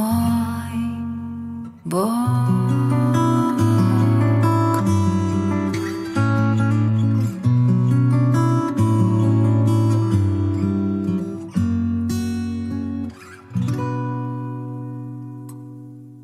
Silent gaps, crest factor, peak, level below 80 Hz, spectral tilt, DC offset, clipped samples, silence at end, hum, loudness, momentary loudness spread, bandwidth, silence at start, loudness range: none; 14 dB; -6 dBFS; -54 dBFS; -8 dB/octave; under 0.1%; under 0.1%; 0 s; none; -20 LUFS; 14 LU; 14 kHz; 0 s; 8 LU